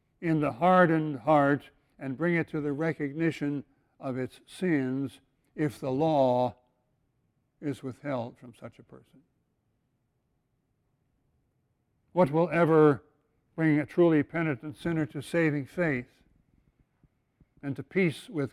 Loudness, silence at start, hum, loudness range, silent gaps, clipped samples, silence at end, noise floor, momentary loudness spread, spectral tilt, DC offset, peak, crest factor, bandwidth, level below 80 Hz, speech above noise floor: -28 LUFS; 0.2 s; none; 15 LU; none; under 0.1%; 0.05 s; -76 dBFS; 16 LU; -8 dB/octave; under 0.1%; -10 dBFS; 20 dB; 13 kHz; -66 dBFS; 48 dB